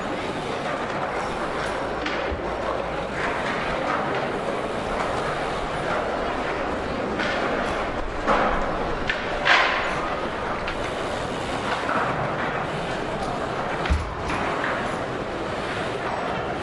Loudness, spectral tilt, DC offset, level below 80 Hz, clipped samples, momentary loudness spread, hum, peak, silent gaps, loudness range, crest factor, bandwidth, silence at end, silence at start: -25 LUFS; -5 dB/octave; under 0.1%; -38 dBFS; under 0.1%; 4 LU; none; -4 dBFS; none; 4 LU; 22 dB; 11.5 kHz; 0 s; 0 s